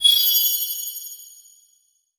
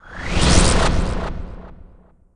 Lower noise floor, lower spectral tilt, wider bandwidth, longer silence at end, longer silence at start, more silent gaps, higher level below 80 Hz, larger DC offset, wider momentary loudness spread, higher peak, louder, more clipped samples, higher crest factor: first, -64 dBFS vs -48 dBFS; second, 6 dB/octave vs -4 dB/octave; first, over 20 kHz vs 10.5 kHz; first, 0.9 s vs 0.5 s; about the same, 0 s vs 0.05 s; neither; second, -70 dBFS vs -22 dBFS; neither; about the same, 21 LU vs 21 LU; about the same, -4 dBFS vs -2 dBFS; about the same, -18 LUFS vs -18 LUFS; neither; about the same, 18 dB vs 16 dB